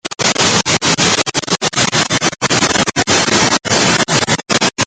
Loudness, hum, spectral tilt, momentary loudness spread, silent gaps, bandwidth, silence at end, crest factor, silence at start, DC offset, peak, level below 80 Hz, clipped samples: -12 LUFS; none; -2 dB/octave; 3 LU; none; 10.5 kHz; 0 s; 14 dB; 0.05 s; under 0.1%; 0 dBFS; -46 dBFS; under 0.1%